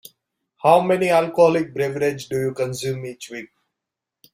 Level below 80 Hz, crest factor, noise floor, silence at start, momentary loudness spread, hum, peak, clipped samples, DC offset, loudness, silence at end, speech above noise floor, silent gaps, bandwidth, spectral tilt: -62 dBFS; 20 dB; -85 dBFS; 0.65 s; 16 LU; none; 0 dBFS; under 0.1%; under 0.1%; -20 LUFS; 0.9 s; 65 dB; none; 16 kHz; -5.5 dB/octave